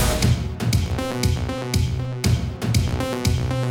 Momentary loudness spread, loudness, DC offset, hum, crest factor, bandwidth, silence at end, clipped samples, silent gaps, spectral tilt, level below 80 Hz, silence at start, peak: 3 LU; -23 LUFS; under 0.1%; none; 14 dB; 18.5 kHz; 0 s; under 0.1%; none; -5.5 dB/octave; -30 dBFS; 0 s; -8 dBFS